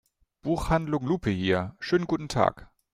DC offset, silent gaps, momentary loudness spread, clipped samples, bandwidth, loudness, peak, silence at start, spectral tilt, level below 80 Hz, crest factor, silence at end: under 0.1%; none; 4 LU; under 0.1%; 15 kHz; -27 LUFS; -6 dBFS; 0.45 s; -6.5 dB/octave; -44 dBFS; 22 dB; 0.3 s